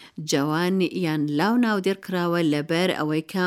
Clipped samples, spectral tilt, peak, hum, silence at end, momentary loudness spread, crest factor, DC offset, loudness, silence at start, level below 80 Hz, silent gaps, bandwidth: under 0.1%; -5.5 dB/octave; -8 dBFS; none; 0 s; 4 LU; 14 dB; under 0.1%; -23 LUFS; 0 s; -72 dBFS; none; 16 kHz